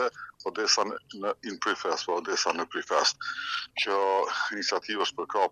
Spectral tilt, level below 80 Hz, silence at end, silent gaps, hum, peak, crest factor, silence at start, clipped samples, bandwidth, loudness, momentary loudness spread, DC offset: -0.5 dB/octave; -76 dBFS; 0 s; none; none; -10 dBFS; 20 dB; 0 s; under 0.1%; 10.5 kHz; -28 LUFS; 8 LU; under 0.1%